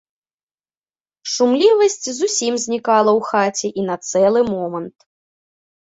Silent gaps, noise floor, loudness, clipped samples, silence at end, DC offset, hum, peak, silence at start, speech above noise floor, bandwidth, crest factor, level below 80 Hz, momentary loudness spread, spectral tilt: none; under -90 dBFS; -17 LUFS; under 0.1%; 1.05 s; under 0.1%; none; -2 dBFS; 1.25 s; over 73 dB; 8 kHz; 16 dB; -62 dBFS; 11 LU; -3.5 dB/octave